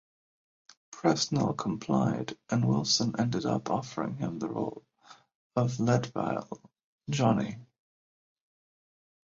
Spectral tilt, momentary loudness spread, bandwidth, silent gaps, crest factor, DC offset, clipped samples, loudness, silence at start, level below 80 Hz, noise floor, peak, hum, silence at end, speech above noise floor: -5.5 dB/octave; 11 LU; 7.8 kHz; 5.35-5.50 s, 6.84-6.99 s; 22 dB; under 0.1%; under 0.1%; -30 LUFS; 0.9 s; -64 dBFS; under -90 dBFS; -10 dBFS; none; 1.75 s; over 61 dB